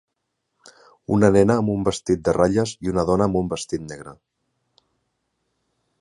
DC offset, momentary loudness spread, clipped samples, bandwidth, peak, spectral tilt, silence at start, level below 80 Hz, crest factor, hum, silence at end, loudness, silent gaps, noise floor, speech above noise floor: under 0.1%; 14 LU; under 0.1%; 11.5 kHz; -2 dBFS; -6.5 dB/octave; 1.1 s; -46 dBFS; 20 dB; none; 1.9 s; -20 LUFS; none; -77 dBFS; 57 dB